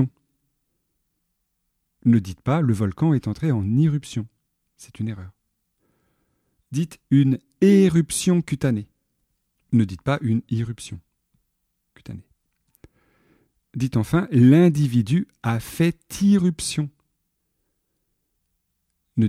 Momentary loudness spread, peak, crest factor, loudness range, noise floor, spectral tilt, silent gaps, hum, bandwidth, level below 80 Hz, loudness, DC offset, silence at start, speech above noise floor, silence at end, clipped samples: 16 LU; -4 dBFS; 18 dB; 10 LU; -75 dBFS; -7 dB/octave; none; none; 15.5 kHz; -54 dBFS; -21 LUFS; under 0.1%; 0 s; 55 dB; 0 s; under 0.1%